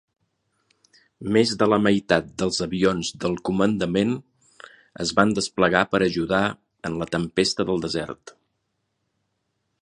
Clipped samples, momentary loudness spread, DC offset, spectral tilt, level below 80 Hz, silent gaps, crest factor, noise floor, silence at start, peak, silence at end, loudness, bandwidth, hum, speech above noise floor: under 0.1%; 10 LU; under 0.1%; -5 dB/octave; -52 dBFS; none; 24 dB; -75 dBFS; 1.2 s; 0 dBFS; 1.5 s; -22 LUFS; 11 kHz; none; 53 dB